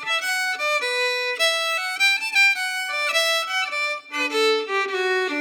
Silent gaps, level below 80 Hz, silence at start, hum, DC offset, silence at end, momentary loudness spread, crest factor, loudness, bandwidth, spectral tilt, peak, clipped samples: none; under -90 dBFS; 0 s; none; under 0.1%; 0 s; 7 LU; 14 dB; -20 LUFS; over 20 kHz; 1.5 dB/octave; -10 dBFS; under 0.1%